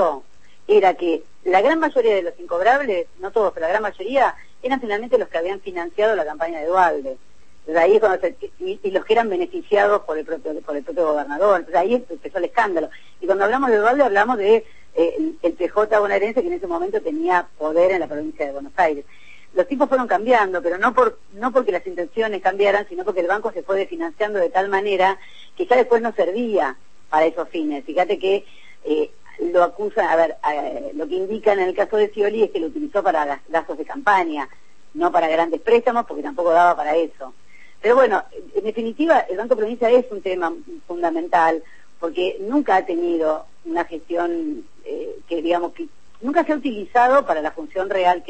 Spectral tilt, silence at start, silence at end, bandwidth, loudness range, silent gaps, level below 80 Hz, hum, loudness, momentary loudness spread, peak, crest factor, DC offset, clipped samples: -5 dB/octave; 0 s; 0.1 s; 8.6 kHz; 3 LU; none; -58 dBFS; none; -20 LUFS; 11 LU; -4 dBFS; 16 dB; 1%; under 0.1%